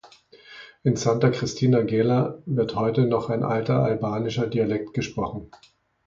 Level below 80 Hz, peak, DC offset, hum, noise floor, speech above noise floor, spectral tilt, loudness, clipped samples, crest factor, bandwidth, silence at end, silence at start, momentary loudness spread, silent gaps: -54 dBFS; -6 dBFS; under 0.1%; none; -51 dBFS; 28 dB; -7 dB/octave; -24 LUFS; under 0.1%; 18 dB; 7.6 kHz; 0.6 s; 0.05 s; 8 LU; none